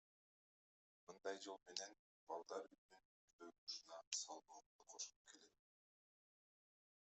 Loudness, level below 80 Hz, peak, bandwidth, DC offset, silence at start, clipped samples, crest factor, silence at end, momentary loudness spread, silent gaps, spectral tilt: -53 LUFS; under -90 dBFS; -24 dBFS; 8.2 kHz; under 0.1%; 1.1 s; under 0.1%; 34 dB; 1.6 s; 18 LU; 1.99-2.27 s, 2.78-2.89 s, 3.05-3.39 s, 3.58-3.67 s, 4.07-4.12 s, 4.66-4.79 s, 5.16-5.25 s; 0 dB/octave